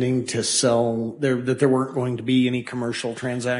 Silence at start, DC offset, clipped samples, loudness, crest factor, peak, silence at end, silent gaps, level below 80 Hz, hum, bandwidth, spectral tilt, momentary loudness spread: 0 s; under 0.1%; under 0.1%; -22 LUFS; 16 dB; -6 dBFS; 0 s; none; -60 dBFS; none; 11 kHz; -4.5 dB/octave; 8 LU